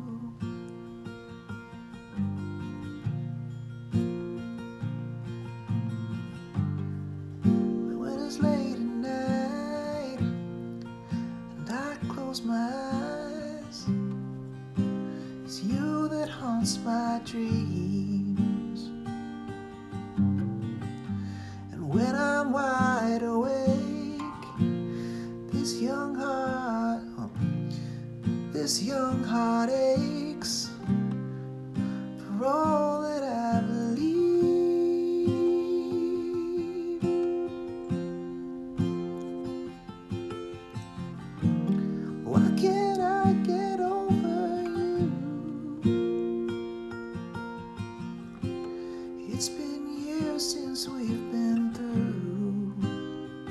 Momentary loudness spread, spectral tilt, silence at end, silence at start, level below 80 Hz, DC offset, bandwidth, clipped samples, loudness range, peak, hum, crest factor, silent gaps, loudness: 13 LU; -6 dB/octave; 0 s; 0 s; -58 dBFS; under 0.1%; 13 kHz; under 0.1%; 8 LU; -10 dBFS; none; 20 dB; none; -30 LUFS